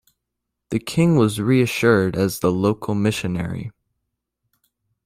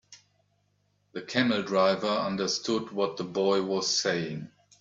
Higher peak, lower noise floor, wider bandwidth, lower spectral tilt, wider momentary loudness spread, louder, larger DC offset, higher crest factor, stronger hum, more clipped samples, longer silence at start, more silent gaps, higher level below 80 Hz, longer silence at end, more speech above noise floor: first, -2 dBFS vs -10 dBFS; first, -80 dBFS vs -72 dBFS; first, 16 kHz vs 8 kHz; first, -6.5 dB/octave vs -3.5 dB/octave; about the same, 11 LU vs 13 LU; first, -20 LUFS vs -27 LUFS; neither; about the same, 18 dB vs 20 dB; second, none vs 50 Hz at -50 dBFS; neither; first, 0.7 s vs 0.1 s; neither; first, -52 dBFS vs -70 dBFS; first, 1.35 s vs 0.35 s; first, 61 dB vs 44 dB